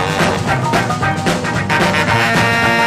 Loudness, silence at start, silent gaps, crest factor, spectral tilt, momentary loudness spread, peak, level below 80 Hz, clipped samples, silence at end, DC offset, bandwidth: -14 LUFS; 0 s; none; 14 dB; -4.5 dB/octave; 4 LU; 0 dBFS; -38 dBFS; under 0.1%; 0 s; under 0.1%; 15.5 kHz